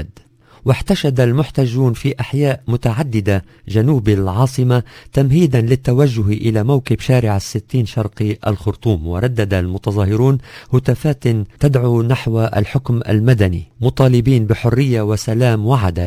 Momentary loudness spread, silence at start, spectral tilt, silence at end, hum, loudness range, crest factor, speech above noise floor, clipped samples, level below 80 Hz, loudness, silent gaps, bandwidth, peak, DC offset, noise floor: 6 LU; 0 s; -7.5 dB/octave; 0 s; none; 3 LU; 14 dB; 31 dB; under 0.1%; -34 dBFS; -16 LUFS; none; 15.5 kHz; 0 dBFS; under 0.1%; -46 dBFS